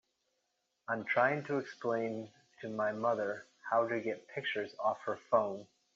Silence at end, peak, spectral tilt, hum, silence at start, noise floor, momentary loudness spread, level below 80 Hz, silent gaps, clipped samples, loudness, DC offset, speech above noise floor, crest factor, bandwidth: 0.3 s; -16 dBFS; -3.5 dB/octave; none; 0.9 s; -82 dBFS; 14 LU; -84 dBFS; none; under 0.1%; -35 LUFS; under 0.1%; 48 dB; 20 dB; 7.4 kHz